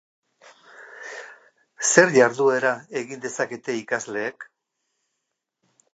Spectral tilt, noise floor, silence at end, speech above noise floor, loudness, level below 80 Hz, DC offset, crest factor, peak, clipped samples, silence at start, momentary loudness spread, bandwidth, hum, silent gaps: -3 dB/octave; -80 dBFS; 1.5 s; 59 dB; -21 LUFS; -80 dBFS; under 0.1%; 24 dB; 0 dBFS; under 0.1%; 0.8 s; 21 LU; 9.2 kHz; none; none